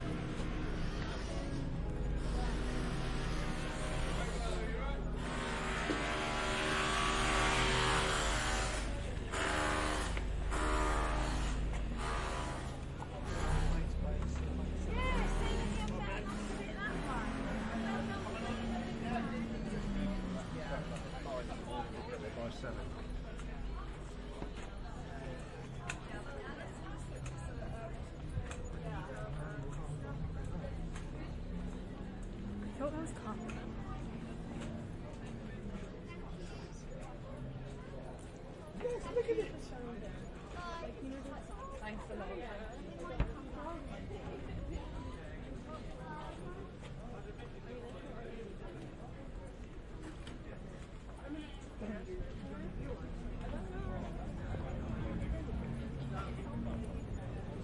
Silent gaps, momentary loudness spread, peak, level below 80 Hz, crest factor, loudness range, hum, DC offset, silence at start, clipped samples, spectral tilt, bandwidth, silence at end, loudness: none; 13 LU; -20 dBFS; -44 dBFS; 18 dB; 13 LU; none; under 0.1%; 0 s; under 0.1%; -5 dB/octave; 11.5 kHz; 0 s; -41 LUFS